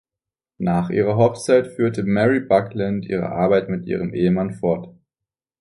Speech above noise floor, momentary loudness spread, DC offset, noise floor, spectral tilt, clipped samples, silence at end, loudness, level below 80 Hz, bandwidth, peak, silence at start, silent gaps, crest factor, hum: 69 dB; 7 LU; under 0.1%; -88 dBFS; -7.5 dB/octave; under 0.1%; 0.7 s; -20 LUFS; -50 dBFS; 11.5 kHz; -2 dBFS; 0.6 s; none; 18 dB; none